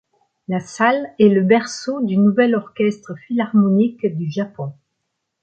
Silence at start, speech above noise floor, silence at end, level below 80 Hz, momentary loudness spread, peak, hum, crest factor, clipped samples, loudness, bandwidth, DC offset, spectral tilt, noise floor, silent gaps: 0.5 s; 58 dB; 0.7 s; -64 dBFS; 12 LU; -2 dBFS; none; 16 dB; under 0.1%; -18 LUFS; 8.8 kHz; under 0.1%; -7 dB/octave; -75 dBFS; none